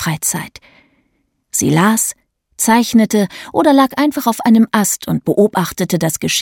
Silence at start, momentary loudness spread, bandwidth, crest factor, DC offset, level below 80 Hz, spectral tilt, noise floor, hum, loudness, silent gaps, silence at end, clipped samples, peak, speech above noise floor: 0 s; 7 LU; 18.5 kHz; 14 dB; under 0.1%; -52 dBFS; -4 dB/octave; -64 dBFS; none; -14 LUFS; none; 0 s; under 0.1%; 0 dBFS; 50 dB